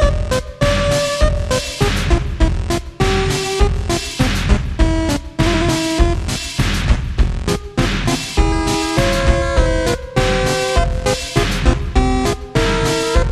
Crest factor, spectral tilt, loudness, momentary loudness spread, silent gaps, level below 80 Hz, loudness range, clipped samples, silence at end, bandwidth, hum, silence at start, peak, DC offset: 16 dB; -5 dB/octave; -17 LUFS; 4 LU; none; -20 dBFS; 1 LU; under 0.1%; 0 s; 13 kHz; none; 0 s; 0 dBFS; under 0.1%